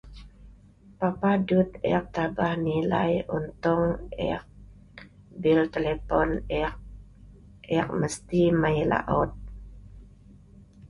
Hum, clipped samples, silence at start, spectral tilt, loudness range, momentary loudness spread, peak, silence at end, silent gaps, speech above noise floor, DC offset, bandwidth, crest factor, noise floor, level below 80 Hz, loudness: none; under 0.1%; 0.05 s; -7 dB/octave; 2 LU; 9 LU; -8 dBFS; 0 s; none; 28 dB; under 0.1%; 11.5 kHz; 20 dB; -53 dBFS; -44 dBFS; -26 LUFS